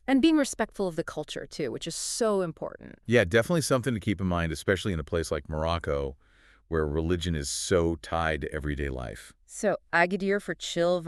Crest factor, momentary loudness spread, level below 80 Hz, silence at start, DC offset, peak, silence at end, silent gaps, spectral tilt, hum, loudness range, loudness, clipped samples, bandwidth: 20 dB; 10 LU; -44 dBFS; 0.1 s; under 0.1%; -8 dBFS; 0 s; none; -5 dB/octave; none; 3 LU; -28 LUFS; under 0.1%; 13.5 kHz